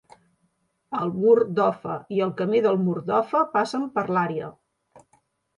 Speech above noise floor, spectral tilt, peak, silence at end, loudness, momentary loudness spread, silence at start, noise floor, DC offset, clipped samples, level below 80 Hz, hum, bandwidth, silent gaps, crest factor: 48 dB; -7.5 dB/octave; -6 dBFS; 0.6 s; -23 LUFS; 11 LU; 0.9 s; -71 dBFS; under 0.1%; under 0.1%; -68 dBFS; none; 10.5 kHz; none; 18 dB